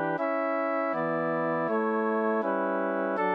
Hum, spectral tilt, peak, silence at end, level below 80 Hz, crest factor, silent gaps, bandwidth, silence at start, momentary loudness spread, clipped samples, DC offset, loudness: none; -9 dB/octave; -16 dBFS; 0 s; -88 dBFS; 12 dB; none; 5.6 kHz; 0 s; 1 LU; under 0.1%; under 0.1%; -28 LUFS